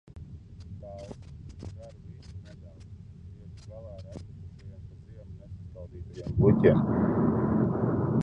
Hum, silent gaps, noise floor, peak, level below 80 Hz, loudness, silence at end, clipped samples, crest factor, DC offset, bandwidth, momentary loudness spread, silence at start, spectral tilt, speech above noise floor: none; none; -47 dBFS; -8 dBFS; -46 dBFS; -25 LUFS; 0 s; under 0.1%; 22 dB; under 0.1%; 7.4 kHz; 24 LU; 0.15 s; -10 dB/octave; 22 dB